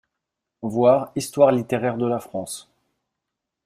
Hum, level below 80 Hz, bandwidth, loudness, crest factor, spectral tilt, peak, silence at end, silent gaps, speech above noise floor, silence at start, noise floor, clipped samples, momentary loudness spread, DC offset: none; -64 dBFS; 15.5 kHz; -21 LUFS; 20 dB; -6 dB/octave; -4 dBFS; 1.05 s; none; 62 dB; 0.6 s; -83 dBFS; under 0.1%; 15 LU; under 0.1%